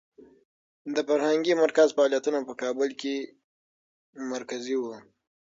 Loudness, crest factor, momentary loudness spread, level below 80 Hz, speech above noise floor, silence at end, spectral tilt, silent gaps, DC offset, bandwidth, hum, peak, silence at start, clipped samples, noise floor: -26 LUFS; 20 dB; 17 LU; -80 dBFS; over 64 dB; 0.5 s; -3.5 dB/octave; 3.44-4.13 s; under 0.1%; 7.8 kHz; none; -8 dBFS; 0.85 s; under 0.1%; under -90 dBFS